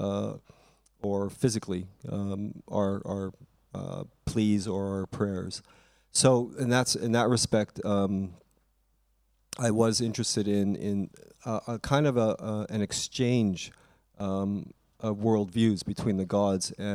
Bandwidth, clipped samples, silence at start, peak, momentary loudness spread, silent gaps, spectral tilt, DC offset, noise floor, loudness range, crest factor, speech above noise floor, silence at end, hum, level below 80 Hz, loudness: 15 kHz; under 0.1%; 0 s; -8 dBFS; 13 LU; none; -5 dB/octave; under 0.1%; -70 dBFS; 6 LU; 22 dB; 42 dB; 0 s; none; -58 dBFS; -29 LUFS